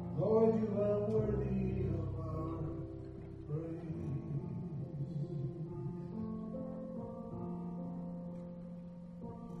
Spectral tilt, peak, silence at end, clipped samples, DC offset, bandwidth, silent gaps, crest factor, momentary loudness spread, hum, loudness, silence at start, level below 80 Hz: -11 dB/octave; -20 dBFS; 0 s; under 0.1%; under 0.1%; 6.6 kHz; none; 18 dB; 15 LU; none; -39 LUFS; 0 s; -54 dBFS